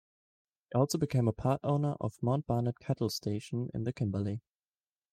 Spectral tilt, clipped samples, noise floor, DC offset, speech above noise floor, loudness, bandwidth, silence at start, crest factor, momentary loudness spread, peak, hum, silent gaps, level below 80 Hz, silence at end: -7 dB/octave; under 0.1%; under -90 dBFS; under 0.1%; over 58 dB; -33 LUFS; 15.5 kHz; 0.7 s; 18 dB; 6 LU; -16 dBFS; none; none; -62 dBFS; 0.75 s